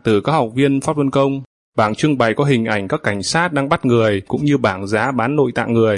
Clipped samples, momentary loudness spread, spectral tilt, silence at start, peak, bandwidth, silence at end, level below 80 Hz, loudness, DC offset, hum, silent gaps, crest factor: under 0.1%; 4 LU; -6 dB/octave; 0.05 s; -2 dBFS; 11.5 kHz; 0 s; -52 dBFS; -17 LUFS; under 0.1%; none; 1.46-1.72 s; 14 dB